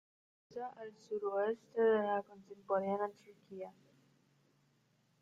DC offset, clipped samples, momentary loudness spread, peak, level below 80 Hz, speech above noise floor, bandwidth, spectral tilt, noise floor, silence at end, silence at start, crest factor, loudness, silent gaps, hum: under 0.1%; under 0.1%; 20 LU; -22 dBFS; -86 dBFS; 37 dB; 7.4 kHz; -7 dB/octave; -75 dBFS; 1.5 s; 0.5 s; 18 dB; -37 LUFS; none; none